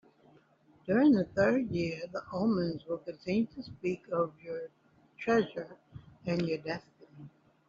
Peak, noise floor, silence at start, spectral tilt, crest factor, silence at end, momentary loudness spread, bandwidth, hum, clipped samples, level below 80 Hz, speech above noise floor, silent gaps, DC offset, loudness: -14 dBFS; -64 dBFS; 0.85 s; -6 dB/octave; 18 dB; 0.4 s; 17 LU; 7.4 kHz; none; under 0.1%; -66 dBFS; 33 dB; none; under 0.1%; -32 LUFS